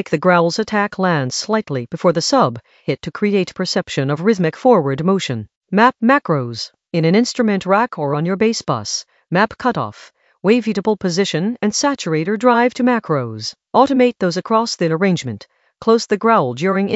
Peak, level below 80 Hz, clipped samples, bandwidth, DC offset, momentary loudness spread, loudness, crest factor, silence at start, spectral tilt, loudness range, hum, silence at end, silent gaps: 0 dBFS; -58 dBFS; under 0.1%; 8.2 kHz; under 0.1%; 9 LU; -17 LUFS; 16 dB; 0 s; -5 dB/octave; 2 LU; none; 0 s; 5.57-5.61 s